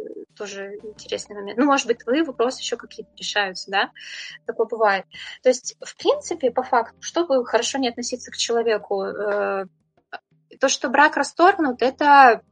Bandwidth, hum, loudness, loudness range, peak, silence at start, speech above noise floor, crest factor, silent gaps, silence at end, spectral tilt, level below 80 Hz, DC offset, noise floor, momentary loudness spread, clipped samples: 9.6 kHz; none; -21 LUFS; 4 LU; 0 dBFS; 0 s; 21 dB; 20 dB; none; 0.15 s; -2 dB/octave; -68 dBFS; under 0.1%; -42 dBFS; 17 LU; under 0.1%